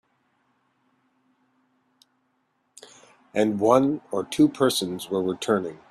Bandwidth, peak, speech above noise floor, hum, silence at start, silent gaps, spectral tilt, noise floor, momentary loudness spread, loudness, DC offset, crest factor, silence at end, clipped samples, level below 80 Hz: 14.5 kHz; -4 dBFS; 49 dB; none; 3.35 s; none; -5 dB/octave; -71 dBFS; 9 LU; -23 LUFS; under 0.1%; 22 dB; 0.15 s; under 0.1%; -66 dBFS